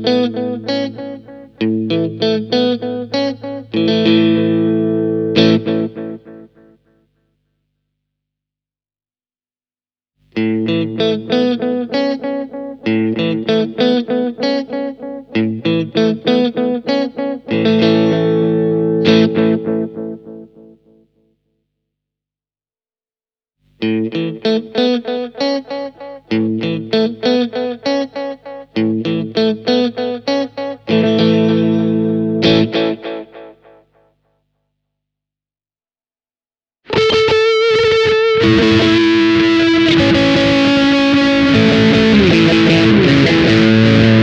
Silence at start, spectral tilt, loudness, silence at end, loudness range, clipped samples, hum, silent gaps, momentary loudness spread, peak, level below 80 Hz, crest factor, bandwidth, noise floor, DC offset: 0 s; -6.5 dB/octave; -14 LUFS; 0 s; 11 LU; under 0.1%; 50 Hz at -55 dBFS; none; 13 LU; 0 dBFS; -44 dBFS; 14 dB; 8.2 kHz; under -90 dBFS; under 0.1%